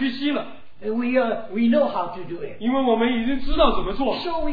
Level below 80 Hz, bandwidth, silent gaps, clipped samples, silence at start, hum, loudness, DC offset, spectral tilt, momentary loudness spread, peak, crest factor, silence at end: -34 dBFS; 5 kHz; none; under 0.1%; 0 s; none; -23 LUFS; 2%; -8 dB/octave; 11 LU; -4 dBFS; 18 dB; 0 s